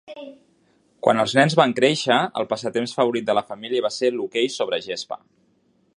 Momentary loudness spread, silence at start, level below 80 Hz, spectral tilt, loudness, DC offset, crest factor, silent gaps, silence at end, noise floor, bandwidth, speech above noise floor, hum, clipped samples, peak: 14 LU; 0.1 s; -68 dBFS; -4.5 dB/octave; -21 LUFS; under 0.1%; 22 dB; none; 0.8 s; -63 dBFS; 11.5 kHz; 42 dB; none; under 0.1%; -2 dBFS